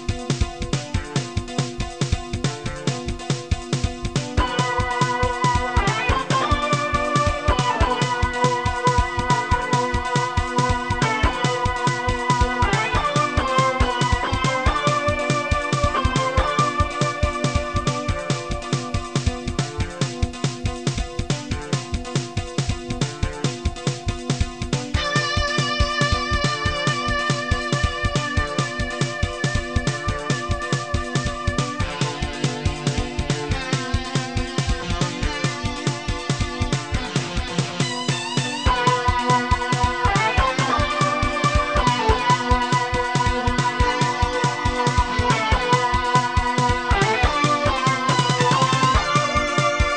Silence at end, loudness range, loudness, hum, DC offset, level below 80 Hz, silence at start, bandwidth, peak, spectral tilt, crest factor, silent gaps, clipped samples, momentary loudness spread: 0 s; 6 LU; -22 LUFS; none; 0.3%; -30 dBFS; 0 s; 11 kHz; -4 dBFS; -4.5 dB/octave; 18 dB; none; under 0.1%; 7 LU